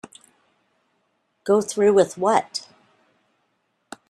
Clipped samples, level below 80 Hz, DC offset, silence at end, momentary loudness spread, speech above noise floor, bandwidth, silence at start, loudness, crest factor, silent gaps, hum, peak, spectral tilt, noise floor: under 0.1%; -70 dBFS; under 0.1%; 1.5 s; 16 LU; 52 dB; 12.5 kHz; 1.45 s; -20 LUFS; 20 dB; none; none; -4 dBFS; -4.5 dB/octave; -71 dBFS